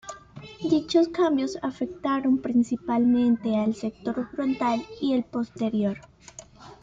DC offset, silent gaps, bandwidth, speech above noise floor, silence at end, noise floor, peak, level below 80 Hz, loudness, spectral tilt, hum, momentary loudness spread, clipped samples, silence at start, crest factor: under 0.1%; none; 7.8 kHz; 22 dB; 0.1 s; -47 dBFS; -10 dBFS; -60 dBFS; -25 LUFS; -6 dB/octave; none; 19 LU; under 0.1%; 0.05 s; 16 dB